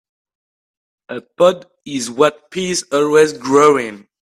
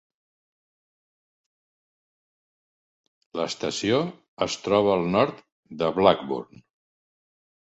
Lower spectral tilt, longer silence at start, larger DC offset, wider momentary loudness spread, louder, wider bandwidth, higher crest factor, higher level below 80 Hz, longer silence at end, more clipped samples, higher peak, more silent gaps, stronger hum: about the same, -4 dB/octave vs -5 dB/octave; second, 1.1 s vs 3.35 s; neither; first, 17 LU vs 12 LU; first, -15 LUFS vs -24 LUFS; first, 13.5 kHz vs 8.2 kHz; second, 16 dB vs 26 dB; about the same, -60 dBFS vs -60 dBFS; second, 0.25 s vs 1.3 s; neither; about the same, 0 dBFS vs -2 dBFS; second, none vs 4.28-4.37 s, 5.52-5.63 s; neither